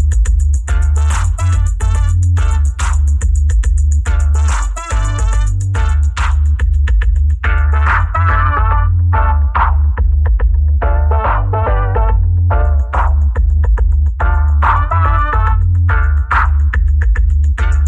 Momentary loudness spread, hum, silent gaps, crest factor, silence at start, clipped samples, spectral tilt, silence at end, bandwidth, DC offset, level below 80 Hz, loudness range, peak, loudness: 2 LU; none; none; 8 dB; 0 s; under 0.1%; -6 dB/octave; 0 s; 9.4 kHz; under 0.1%; -12 dBFS; 2 LU; -2 dBFS; -14 LUFS